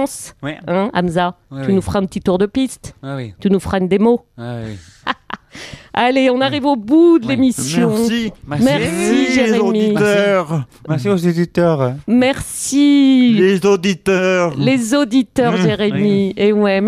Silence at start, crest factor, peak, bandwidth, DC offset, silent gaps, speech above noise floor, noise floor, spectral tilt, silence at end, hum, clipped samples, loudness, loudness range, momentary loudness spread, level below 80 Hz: 0 s; 12 dB; -2 dBFS; 15 kHz; under 0.1%; none; 20 dB; -35 dBFS; -5.5 dB/octave; 0 s; none; under 0.1%; -15 LUFS; 5 LU; 15 LU; -46 dBFS